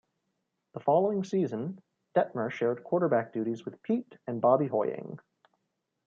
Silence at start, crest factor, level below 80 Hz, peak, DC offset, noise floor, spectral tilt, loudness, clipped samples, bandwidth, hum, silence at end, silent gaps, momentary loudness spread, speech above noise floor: 0.75 s; 20 dB; -80 dBFS; -10 dBFS; under 0.1%; -82 dBFS; -8 dB/octave; -30 LUFS; under 0.1%; 7.4 kHz; none; 0.9 s; none; 14 LU; 53 dB